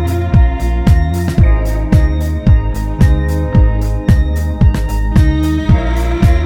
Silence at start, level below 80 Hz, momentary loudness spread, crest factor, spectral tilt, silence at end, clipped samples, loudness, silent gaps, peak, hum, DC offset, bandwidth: 0 s; -14 dBFS; 3 LU; 10 dB; -8 dB/octave; 0 s; 0.2%; -13 LUFS; none; 0 dBFS; none; under 0.1%; 16 kHz